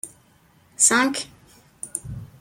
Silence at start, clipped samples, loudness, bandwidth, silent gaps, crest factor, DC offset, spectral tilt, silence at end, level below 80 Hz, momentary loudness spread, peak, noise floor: 0.05 s; under 0.1%; -20 LUFS; 16.5 kHz; none; 20 dB; under 0.1%; -1.5 dB/octave; 0.15 s; -54 dBFS; 22 LU; -4 dBFS; -57 dBFS